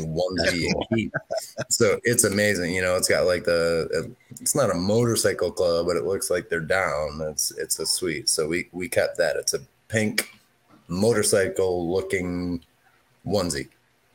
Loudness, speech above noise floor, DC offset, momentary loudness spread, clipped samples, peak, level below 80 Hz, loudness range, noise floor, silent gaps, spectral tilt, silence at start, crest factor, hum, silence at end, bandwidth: -24 LUFS; 38 dB; under 0.1%; 9 LU; under 0.1%; -4 dBFS; -54 dBFS; 3 LU; -62 dBFS; none; -3.5 dB/octave; 0 s; 20 dB; none; 0.5 s; 17 kHz